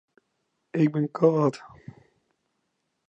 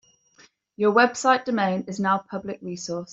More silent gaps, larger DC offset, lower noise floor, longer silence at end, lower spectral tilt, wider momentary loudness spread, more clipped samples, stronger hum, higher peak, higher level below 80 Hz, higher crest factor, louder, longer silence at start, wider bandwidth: neither; neither; first, -77 dBFS vs -57 dBFS; first, 1.4 s vs 0 s; first, -9 dB/octave vs -4.5 dB/octave; about the same, 12 LU vs 14 LU; neither; neither; about the same, -6 dBFS vs -6 dBFS; about the same, -72 dBFS vs -68 dBFS; about the same, 22 dB vs 18 dB; about the same, -24 LUFS vs -23 LUFS; about the same, 0.75 s vs 0.8 s; about the same, 8.4 kHz vs 8 kHz